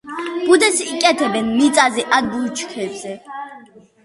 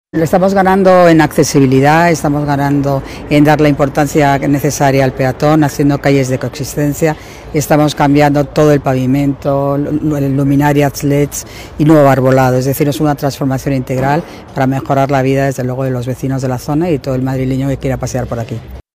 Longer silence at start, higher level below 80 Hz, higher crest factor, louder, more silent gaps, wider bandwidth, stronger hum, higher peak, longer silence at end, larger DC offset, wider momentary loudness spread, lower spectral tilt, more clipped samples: about the same, 0.05 s vs 0.15 s; second, -58 dBFS vs -34 dBFS; first, 18 dB vs 12 dB; second, -16 LUFS vs -12 LUFS; neither; second, 12 kHz vs 16 kHz; neither; about the same, 0 dBFS vs 0 dBFS; first, 0.45 s vs 0.15 s; neither; first, 17 LU vs 9 LU; second, -2.5 dB/octave vs -6.5 dB/octave; neither